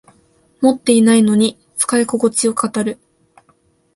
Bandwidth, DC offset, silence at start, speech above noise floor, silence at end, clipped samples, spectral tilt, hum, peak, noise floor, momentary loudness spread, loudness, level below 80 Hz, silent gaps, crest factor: 12 kHz; under 0.1%; 0.6 s; 43 dB; 1 s; under 0.1%; -4 dB/octave; none; 0 dBFS; -57 dBFS; 9 LU; -15 LUFS; -60 dBFS; none; 16 dB